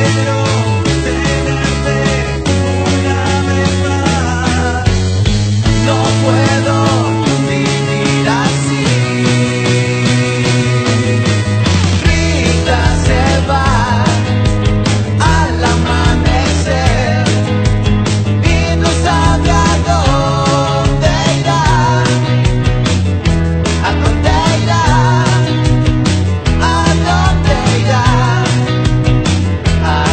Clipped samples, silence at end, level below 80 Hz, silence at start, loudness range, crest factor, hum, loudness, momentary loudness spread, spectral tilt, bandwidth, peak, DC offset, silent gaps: under 0.1%; 0 s; -20 dBFS; 0 s; 2 LU; 12 dB; none; -12 LUFS; 3 LU; -5.5 dB/octave; 9.2 kHz; 0 dBFS; under 0.1%; none